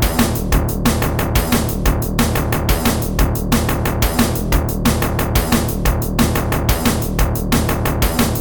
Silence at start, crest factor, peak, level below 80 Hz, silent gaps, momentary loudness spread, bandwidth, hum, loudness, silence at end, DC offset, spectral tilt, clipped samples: 0 s; 16 dB; -2 dBFS; -22 dBFS; none; 2 LU; over 20 kHz; none; -17 LUFS; 0 s; under 0.1%; -5 dB/octave; under 0.1%